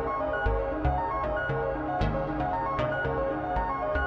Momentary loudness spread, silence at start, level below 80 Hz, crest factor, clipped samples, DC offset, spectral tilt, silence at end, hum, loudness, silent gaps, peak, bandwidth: 1 LU; 0 s; -36 dBFS; 14 dB; under 0.1%; under 0.1%; -8.5 dB/octave; 0 s; none; -29 LUFS; none; -14 dBFS; 6.4 kHz